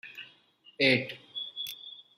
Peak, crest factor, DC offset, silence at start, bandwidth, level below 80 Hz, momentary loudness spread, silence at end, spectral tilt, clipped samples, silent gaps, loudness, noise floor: -10 dBFS; 24 dB; under 0.1%; 0.05 s; 16 kHz; -78 dBFS; 21 LU; 0.15 s; -4.5 dB/octave; under 0.1%; none; -29 LUFS; -61 dBFS